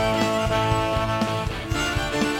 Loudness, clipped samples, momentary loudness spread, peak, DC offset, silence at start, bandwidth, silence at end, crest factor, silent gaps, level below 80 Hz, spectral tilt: -23 LUFS; under 0.1%; 4 LU; -6 dBFS; under 0.1%; 0 s; 17 kHz; 0 s; 16 dB; none; -36 dBFS; -5 dB/octave